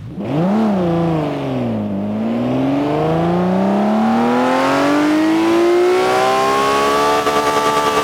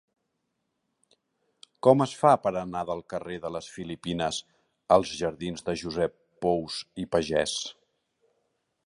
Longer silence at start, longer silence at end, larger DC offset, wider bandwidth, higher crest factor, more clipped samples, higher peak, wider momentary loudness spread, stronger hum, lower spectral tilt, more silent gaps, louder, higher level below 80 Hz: second, 0 s vs 1.85 s; second, 0 s vs 1.15 s; neither; first, 18 kHz vs 11.5 kHz; second, 12 dB vs 24 dB; neither; about the same, -4 dBFS vs -6 dBFS; second, 6 LU vs 14 LU; neither; about the same, -6 dB/octave vs -5 dB/octave; neither; first, -15 LUFS vs -28 LUFS; first, -46 dBFS vs -58 dBFS